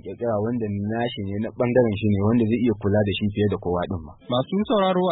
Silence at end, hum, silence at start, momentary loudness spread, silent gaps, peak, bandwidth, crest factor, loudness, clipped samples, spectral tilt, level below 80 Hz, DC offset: 0 s; none; 0 s; 7 LU; none; -6 dBFS; 4.1 kHz; 16 dB; -23 LUFS; under 0.1%; -12 dB/octave; -50 dBFS; under 0.1%